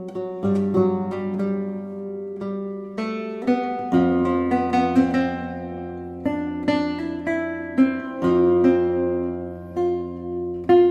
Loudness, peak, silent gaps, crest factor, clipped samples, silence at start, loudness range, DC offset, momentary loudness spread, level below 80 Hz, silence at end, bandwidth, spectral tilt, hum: -23 LUFS; -6 dBFS; none; 16 dB; under 0.1%; 0 s; 4 LU; under 0.1%; 12 LU; -54 dBFS; 0 s; 8 kHz; -8.5 dB/octave; none